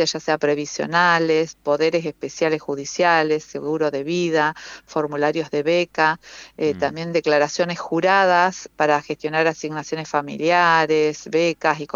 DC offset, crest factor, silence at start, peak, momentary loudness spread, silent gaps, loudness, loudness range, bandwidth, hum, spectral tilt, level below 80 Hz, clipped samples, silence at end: under 0.1%; 18 dB; 0 s; -2 dBFS; 9 LU; none; -20 LUFS; 2 LU; 7.6 kHz; none; -4.5 dB/octave; -62 dBFS; under 0.1%; 0.1 s